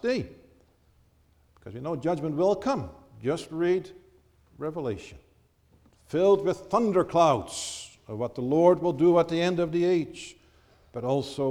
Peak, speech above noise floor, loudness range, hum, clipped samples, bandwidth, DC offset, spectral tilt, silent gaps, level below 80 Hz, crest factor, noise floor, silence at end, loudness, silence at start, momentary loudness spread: -8 dBFS; 37 dB; 7 LU; none; under 0.1%; 12 kHz; under 0.1%; -6 dB/octave; none; -58 dBFS; 20 dB; -63 dBFS; 0 s; -26 LUFS; 0.05 s; 18 LU